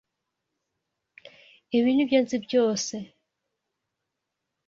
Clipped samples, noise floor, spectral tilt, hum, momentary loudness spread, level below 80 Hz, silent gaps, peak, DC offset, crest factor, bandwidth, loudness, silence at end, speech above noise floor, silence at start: under 0.1%; -83 dBFS; -4 dB/octave; none; 13 LU; -72 dBFS; none; -8 dBFS; under 0.1%; 20 dB; 7.6 kHz; -24 LUFS; 1.6 s; 60 dB; 1.7 s